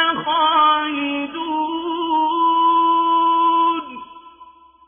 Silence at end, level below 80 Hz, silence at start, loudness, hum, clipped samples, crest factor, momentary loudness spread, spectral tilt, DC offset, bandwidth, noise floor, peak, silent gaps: 0.45 s; -62 dBFS; 0 s; -17 LUFS; none; under 0.1%; 14 dB; 9 LU; -6.5 dB/octave; under 0.1%; 3.6 kHz; -46 dBFS; -4 dBFS; none